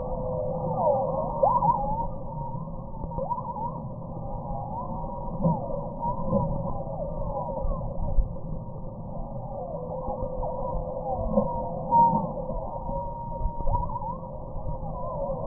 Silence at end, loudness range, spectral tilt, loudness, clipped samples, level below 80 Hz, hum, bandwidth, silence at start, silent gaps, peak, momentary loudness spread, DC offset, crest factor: 0 s; 6 LU; -16.5 dB/octave; -30 LUFS; under 0.1%; -34 dBFS; none; 1.3 kHz; 0 s; none; -8 dBFS; 13 LU; under 0.1%; 20 dB